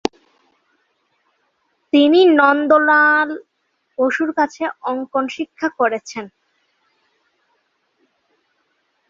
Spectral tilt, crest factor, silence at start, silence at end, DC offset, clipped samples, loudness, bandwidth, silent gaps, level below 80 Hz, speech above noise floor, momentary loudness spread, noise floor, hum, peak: -3.5 dB/octave; 18 dB; 1.95 s; 2.8 s; under 0.1%; under 0.1%; -16 LUFS; 7.6 kHz; none; -66 dBFS; 51 dB; 18 LU; -67 dBFS; none; 0 dBFS